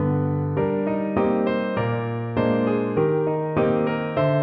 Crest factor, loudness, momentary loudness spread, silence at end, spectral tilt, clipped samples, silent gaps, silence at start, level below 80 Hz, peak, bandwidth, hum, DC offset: 16 dB; -23 LUFS; 3 LU; 0 s; -11 dB/octave; under 0.1%; none; 0 s; -52 dBFS; -6 dBFS; 5.2 kHz; none; under 0.1%